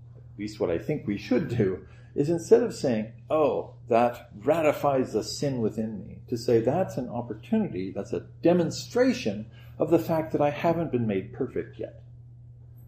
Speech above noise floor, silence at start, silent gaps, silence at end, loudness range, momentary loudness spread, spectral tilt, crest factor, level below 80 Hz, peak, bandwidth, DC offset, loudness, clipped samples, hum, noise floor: 21 dB; 0 s; none; 0.05 s; 3 LU; 12 LU; -6.5 dB/octave; 20 dB; -56 dBFS; -6 dBFS; 15.5 kHz; under 0.1%; -27 LUFS; under 0.1%; none; -48 dBFS